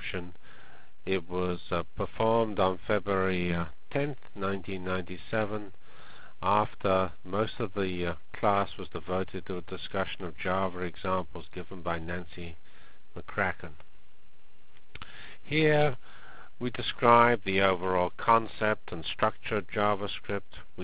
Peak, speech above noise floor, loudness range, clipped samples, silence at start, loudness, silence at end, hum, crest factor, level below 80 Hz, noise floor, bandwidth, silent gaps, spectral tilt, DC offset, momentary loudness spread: -4 dBFS; 32 dB; 9 LU; under 0.1%; 0 s; -30 LUFS; 0 s; none; 26 dB; -52 dBFS; -62 dBFS; 4 kHz; none; -4 dB/octave; 2%; 17 LU